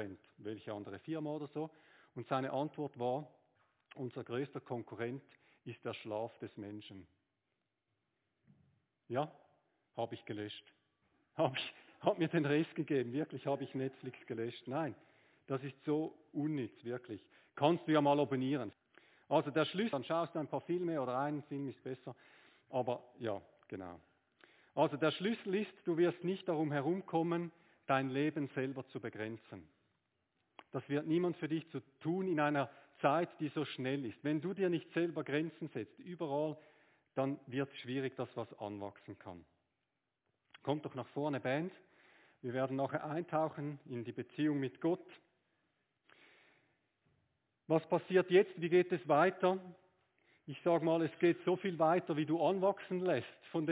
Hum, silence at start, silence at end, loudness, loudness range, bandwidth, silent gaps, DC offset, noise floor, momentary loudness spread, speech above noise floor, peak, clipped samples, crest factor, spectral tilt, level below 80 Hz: none; 0 s; 0 s; -38 LUFS; 11 LU; 4 kHz; none; under 0.1%; -88 dBFS; 16 LU; 50 dB; -16 dBFS; under 0.1%; 22 dB; -5.5 dB/octave; -82 dBFS